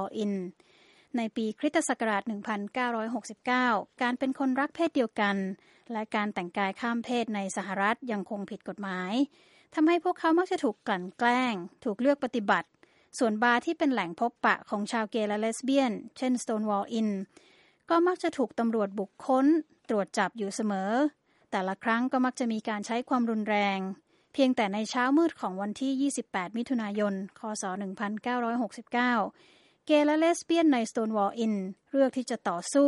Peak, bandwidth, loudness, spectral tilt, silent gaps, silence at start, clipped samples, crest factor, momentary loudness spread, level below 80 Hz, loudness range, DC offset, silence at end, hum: -10 dBFS; 11.5 kHz; -29 LUFS; -4.5 dB/octave; none; 0 s; under 0.1%; 20 dB; 9 LU; -78 dBFS; 4 LU; under 0.1%; 0 s; none